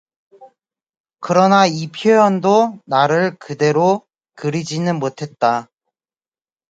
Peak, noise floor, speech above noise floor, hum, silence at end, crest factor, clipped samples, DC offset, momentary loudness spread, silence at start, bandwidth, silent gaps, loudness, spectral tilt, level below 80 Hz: 0 dBFS; under -90 dBFS; over 75 dB; none; 1.05 s; 18 dB; under 0.1%; under 0.1%; 10 LU; 0.4 s; 9 kHz; 1.00-1.04 s; -16 LUFS; -5.5 dB/octave; -64 dBFS